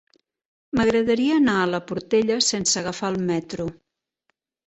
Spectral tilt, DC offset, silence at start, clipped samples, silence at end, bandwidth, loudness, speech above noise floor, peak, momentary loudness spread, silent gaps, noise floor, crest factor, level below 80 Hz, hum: -3.5 dB/octave; under 0.1%; 0.75 s; under 0.1%; 0.95 s; 8.4 kHz; -22 LUFS; 53 dB; -8 dBFS; 9 LU; none; -75 dBFS; 16 dB; -54 dBFS; none